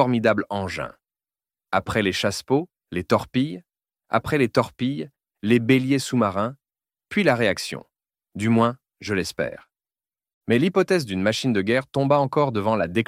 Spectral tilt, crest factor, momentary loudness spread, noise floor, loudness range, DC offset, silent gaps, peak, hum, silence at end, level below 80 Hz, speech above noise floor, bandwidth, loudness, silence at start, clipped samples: -6 dB/octave; 20 dB; 12 LU; under -90 dBFS; 3 LU; under 0.1%; 10.33-10.41 s; -4 dBFS; none; 0.05 s; -56 dBFS; over 68 dB; 15.5 kHz; -23 LUFS; 0 s; under 0.1%